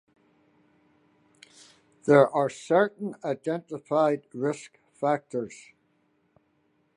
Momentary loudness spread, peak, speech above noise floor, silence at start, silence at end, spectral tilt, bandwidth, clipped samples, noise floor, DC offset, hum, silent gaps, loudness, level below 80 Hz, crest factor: 15 LU; -4 dBFS; 44 dB; 2.05 s; 1.45 s; -6.5 dB/octave; 11 kHz; under 0.1%; -70 dBFS; under 0.1%; none; none; -26 LUFS; -78 dBFS; 24 dB